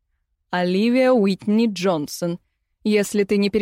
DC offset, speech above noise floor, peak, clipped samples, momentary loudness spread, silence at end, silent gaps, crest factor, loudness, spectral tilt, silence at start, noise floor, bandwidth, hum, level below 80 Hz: under 0.1%; 53 dB; -8 dBFS; under 0.1%; 11 LU; 0 s; none; 12 dB; -20 LUFS; -5.5 dB/octave; 0.5 s; -72 dBFS; 16 kHz; none; -60 dBFS